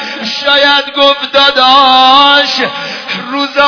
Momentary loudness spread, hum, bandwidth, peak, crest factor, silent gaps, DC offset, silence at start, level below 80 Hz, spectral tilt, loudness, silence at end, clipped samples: 12 LU; none; 5.4 kHz; 0 dBFS; 8 dB; none; under 0.1%; 0 s; -48 dBFS; -2 dB/octave; -7 LUFS; 0 s; 2%